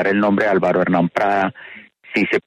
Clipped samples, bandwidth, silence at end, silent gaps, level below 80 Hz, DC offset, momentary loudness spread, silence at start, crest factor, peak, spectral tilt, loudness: under 0.1%; 10 kHz; 0.05 s; none; -58 dBFS; under 0.1%; 9 LU; 0 s; 14 dB; -4 dBFS; -7.5 dB/octave; -18 LUFS